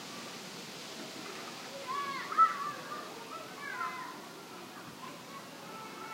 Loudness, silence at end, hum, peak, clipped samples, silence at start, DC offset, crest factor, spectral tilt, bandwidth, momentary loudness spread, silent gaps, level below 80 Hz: -37 LUFS; 0 s; none; -16 dBFS; under 0.1%; 0 s; under 0.1%; 24 dB; -2.5 dB/octave; 16 kHz; 18 LU; none; -86 dBFS